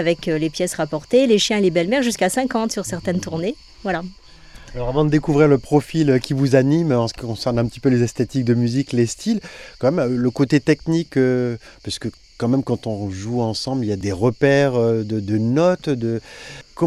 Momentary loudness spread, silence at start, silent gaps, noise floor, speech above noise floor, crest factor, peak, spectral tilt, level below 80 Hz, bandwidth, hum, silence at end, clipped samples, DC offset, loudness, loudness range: 11 LU; 0 s; none; -41 dBFS; 22 dB; 18 dB; -2 dBFS; -6 dB/octave; -46 dBFS; 14.5 kHz; none; 0 s; under 0.1%; under 0.1%; -19 LUFS; 4 LU